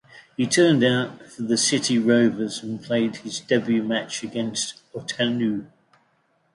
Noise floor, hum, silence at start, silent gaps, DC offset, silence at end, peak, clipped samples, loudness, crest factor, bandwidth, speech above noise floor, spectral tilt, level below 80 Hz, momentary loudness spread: -66 dBFS; none; 0.15 s; none; under 0.1%; 0.9 s; -6 dBFS; under 0.1%; -23 LUFS; 18 dB; 11.5 kHz; 44 dB; -4 dB/octave; -66 dBFS; 14 LU